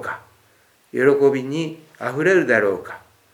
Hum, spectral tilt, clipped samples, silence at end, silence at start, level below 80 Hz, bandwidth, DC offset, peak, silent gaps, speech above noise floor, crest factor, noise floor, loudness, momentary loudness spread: none; -6 dB/octave; under 0.1%; 0.35 s; 0 s; -68 dBFS; 13 kHz; under 0.1%; -2 dBFS; none; 39 dB; 18 dB; -57 dBFS; -19 LUFS; 18 LU